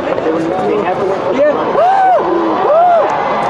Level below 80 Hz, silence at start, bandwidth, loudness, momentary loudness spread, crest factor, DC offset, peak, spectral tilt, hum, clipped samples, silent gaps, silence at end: -50 dBFS; 0 s; 9.8 kHz; -12 LUFS; 6 LU; 12 dB; under 0.1%; 0 dBFS; -6.5 dB/octave; none; under 0.1%; none; 0 s